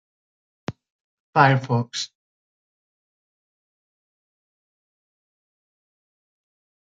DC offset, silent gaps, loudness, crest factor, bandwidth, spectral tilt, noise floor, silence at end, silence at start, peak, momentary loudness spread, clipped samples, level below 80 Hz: under 0.1%; 0.90-1.33 s; -21 LUFS; 26 dB; 7.8 kHz; -5.5 dB/octave; under -90 dBFS; 4.75 s; 0.7 s; -2 dBFS; 20 LU; under 0.1%; -70 dBFS